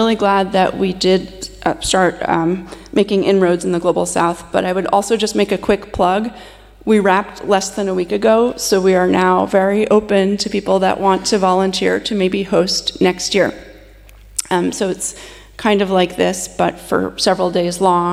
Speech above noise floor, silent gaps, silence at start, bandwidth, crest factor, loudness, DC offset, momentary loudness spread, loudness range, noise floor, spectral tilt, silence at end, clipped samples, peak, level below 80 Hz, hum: 26 dB; none; 0 s; 15 kHz; 14 dB; -16 LUFS; under 0.1%; 6 LU; 4 LU; -41 dBFS; -4.5 dB/octave; 0 s; under 0.1%; -2 dBFS; -42 dBFS; none